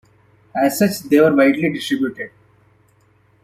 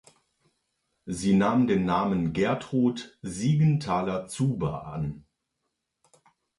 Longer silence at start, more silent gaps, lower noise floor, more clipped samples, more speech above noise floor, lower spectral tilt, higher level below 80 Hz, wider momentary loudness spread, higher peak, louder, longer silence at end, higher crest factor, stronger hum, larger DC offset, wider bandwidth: second, 0.55 s vs 1.05 s; neither; second, -56 dBFS vs -81 dBFS; neither; second, 40 dB vs 55 dB; second, -5.5 dB/octave vs -7 dB/octave; second, -62 dBFS vs -54 dBFS; about the same, 15 LU vs 14 LU; first, -2 dBFS vs -12 dBFS; first, -17 LUFS vs -26 LUFS; second, 1.15 s vs 1.4 s; about the same, 16 dB vs 16 dB; neither; neither; first, 16 kHz vs 11.5 kHz